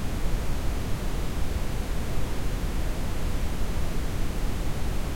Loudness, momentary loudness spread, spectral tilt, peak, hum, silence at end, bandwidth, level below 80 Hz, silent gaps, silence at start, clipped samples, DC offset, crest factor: -32 LUFS; 1 LU; -5.5 dB/octave; -14 dBFS; none; 0 s; 16.5 kHz; -28 dBFS; none; 0 s; under 0.1%; under 0.1%; 12 dB